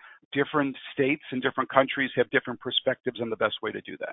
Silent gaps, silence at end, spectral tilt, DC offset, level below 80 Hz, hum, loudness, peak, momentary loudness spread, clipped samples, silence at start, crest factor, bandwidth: 0.25-0.31 s; 0 s; -9 dB/octave; under 0.1%; -68 dBFS; none; -27 LUFS; -4 dBFS; 8 LU; under 0.1%; 0.05 s; 24 dB; 4 kHz